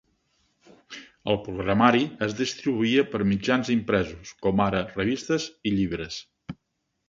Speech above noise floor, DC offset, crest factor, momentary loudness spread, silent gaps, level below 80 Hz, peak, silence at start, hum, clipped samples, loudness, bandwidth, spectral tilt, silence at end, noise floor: 53 dB; under 0.1%; 24 dB; 21 LU; none; -52 dBFS; -2 dBFS; 0.9 s; none; under 0.1%; -25 LUFS; 7.6 kHz; -5.5 dB/octave; 0.55 s; -78 dBFS